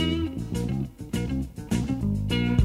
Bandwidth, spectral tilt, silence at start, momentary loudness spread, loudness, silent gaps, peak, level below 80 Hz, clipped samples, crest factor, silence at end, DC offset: 15.5 kHz; -6.5 dB/octave; 0 s; 6 LU; -28 LUFS; none; -8 dBFS; -38 dBFS; under 0.1%; 18 dB; 0 s; under 0.1%